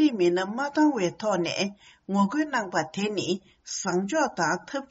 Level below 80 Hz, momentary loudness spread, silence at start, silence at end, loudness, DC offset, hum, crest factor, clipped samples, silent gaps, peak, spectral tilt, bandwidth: -68 dBFS; 8 LU; 0 s; 0.05 s; -27 LUFS; under 0.1%; none; 16 dB; under 0.1%; none; -10 dBFS; -4 dB/octave; 8 kHz